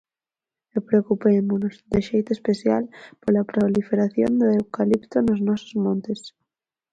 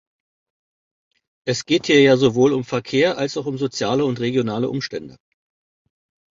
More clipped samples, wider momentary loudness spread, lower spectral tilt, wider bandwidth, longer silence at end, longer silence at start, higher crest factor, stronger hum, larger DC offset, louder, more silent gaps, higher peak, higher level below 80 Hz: neither; second, 9 LU vs 12 LU; first, -8 dB/octave vs -5 dB/octave; about the same, 8 kHz vs 7.6 kHz; second, 0.65 s vs 1.2 s; second, 0.75 s vs 1.45 s; about the same, 16 dB vs 18 dB; neither; neither; second, -22 LUFS vs -19 LUFS; neither; second, -6 dBFS vs -2 dBFS; about the same, -54 dBFS vs -58 dBFS